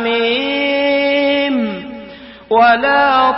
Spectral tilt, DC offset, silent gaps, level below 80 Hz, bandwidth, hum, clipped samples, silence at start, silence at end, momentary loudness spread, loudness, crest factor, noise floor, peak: -8.5 dB/octave; under 0.1%; none; -50 dBFS; 5.8 kHz; none; under 0.1%; 0 s; 0 s; 17 LU; -13 LUFS; 14 dB; -35 dBFS; -2 dBFS